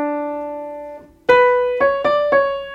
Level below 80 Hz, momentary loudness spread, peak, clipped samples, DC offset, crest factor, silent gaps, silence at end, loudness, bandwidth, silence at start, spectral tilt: -52 dBFS; 17 LU; 0 dBFS; under 0.1%; under 0.1%; 18 dB; none; 0 s; -17 LUFS; 7.2 kHz; 0 s; -5.5 dB/octave